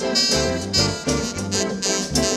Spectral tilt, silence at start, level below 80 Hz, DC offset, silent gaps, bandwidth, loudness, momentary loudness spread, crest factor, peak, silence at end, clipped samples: -3 dB/octave; 0 s; -38 dBFS; under 0.1%; none; 16 kHz; -20 LUFS; 6 LU; 16 dB; -4 dBFS; 0 s; under 0.1%